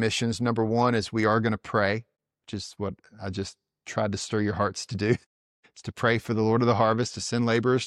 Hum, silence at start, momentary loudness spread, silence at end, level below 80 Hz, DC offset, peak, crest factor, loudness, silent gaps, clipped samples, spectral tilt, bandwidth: none; 0 s; 14 LU; 0 s; -58 dBFS; under 0.1%; -8 dBFS; 18 dB; -26 LUFS; 5.26-5.63 s; under 0.1%; -5.5 dB/octave; 12 kHz